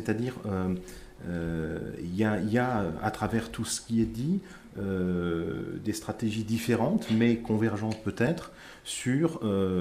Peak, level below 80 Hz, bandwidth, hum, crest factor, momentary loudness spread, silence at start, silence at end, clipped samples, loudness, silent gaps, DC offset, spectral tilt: -12 dBFS; -52 dBFS; 15.5 kHz; none; 16 dB; 10 LU; 0 s; 0 s; under 0.1%; -30 LUFS; none; under 0.1%; -6 dB/octave